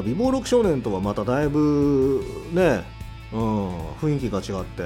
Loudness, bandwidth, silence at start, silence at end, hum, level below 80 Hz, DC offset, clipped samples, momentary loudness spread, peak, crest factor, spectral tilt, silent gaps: -23 LUFS; 16 kHz; 0 s; 0 s; none; -40 dBFS; under 0.1%; under 0.1%; 10 LU; -8 dBFS; 14 dB; -7 dB/octave; none